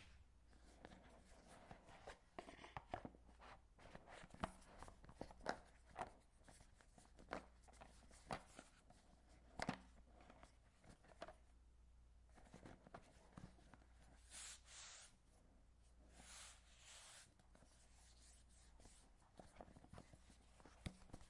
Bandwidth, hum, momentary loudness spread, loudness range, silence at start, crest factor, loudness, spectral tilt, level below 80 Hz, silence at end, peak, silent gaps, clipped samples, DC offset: 12 kHz; none; 15 LU; 9 LU; 0 s; 32 dB; -60 LUFS; -4 dB/octave; -70 dBFS; 0 s; -28 dBFS; none; under 0.1%; under 0.1%